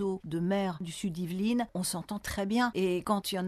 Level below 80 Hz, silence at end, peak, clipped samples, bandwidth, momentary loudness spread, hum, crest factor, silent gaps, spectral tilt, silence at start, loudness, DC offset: -56 dBFS; 0 s; -16 dBFS; under 0.1%; 13.5 kHz; 7 LU; none; 16 dB; none; -5 dB/octave; 0 s; -32 LUFS; under 0.1%